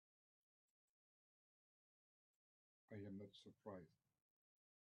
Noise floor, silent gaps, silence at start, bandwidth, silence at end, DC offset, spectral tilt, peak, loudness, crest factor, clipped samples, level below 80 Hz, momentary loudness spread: under -90 dBFS; none; 2.9 s; 4.9 kHz; 1.05 s; under 0.1%; -6 dB/octave; -42 dBFS; -59 LUFS; 22 dB; under 0.1%; under -90 dBFS; 5 LU